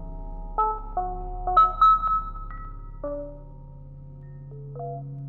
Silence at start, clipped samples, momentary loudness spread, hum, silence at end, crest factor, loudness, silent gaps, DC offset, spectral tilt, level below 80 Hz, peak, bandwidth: 0 s; under 0.1%; 26 LU; none; 0 s; 18 dB; -23 LUFS; none; under 0.1%; -8 dB/octave; -38 dBFS; -8 dBFS; 6.6 kHz